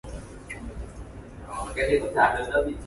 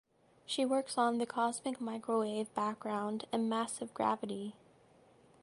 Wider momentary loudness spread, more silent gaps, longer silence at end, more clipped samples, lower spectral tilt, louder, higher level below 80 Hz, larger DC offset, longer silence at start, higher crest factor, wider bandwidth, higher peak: first, 20 LU vs 7 LU; neither; second, 0 s vs 0.9 s; neither; about the same, -5 dB/octave vs -4 dB/octave; first, -25 LUFS vs -36 LUFS; first, -40 dBFS vs -80 dBFS; neither; second, 0.05 s vs 0.5 s; about the same, 20 dB vs 18 dB; about the same, 11.5 kHz vs 11.5 kHz; first, -6 dBFS vs -18 dBFS